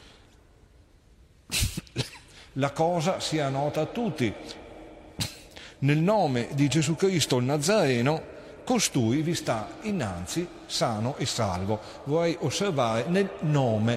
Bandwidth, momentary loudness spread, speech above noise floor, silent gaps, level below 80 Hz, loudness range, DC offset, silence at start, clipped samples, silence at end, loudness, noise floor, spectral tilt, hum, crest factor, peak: 16 kHz; 12 LU; 31 dB; none; -50 dBFS; 4 LU; under 0.1%; 0.05 s; under 0.1%; 0 s; -27 LUFS; -57 dBFS; -5 dB/octave; none; 16 dB; -10 dBFS